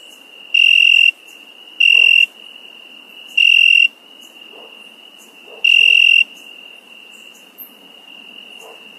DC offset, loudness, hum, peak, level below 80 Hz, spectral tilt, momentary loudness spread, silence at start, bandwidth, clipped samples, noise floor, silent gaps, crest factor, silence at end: under 0.1%; -9 LUFS; none; -2 dBFS; -88 dBFS; 3 dB/octave; 9 LU; 0.55 s; 15 kHz; under 0.1%; -42 dBFS; none; 16 dB; 1.35 s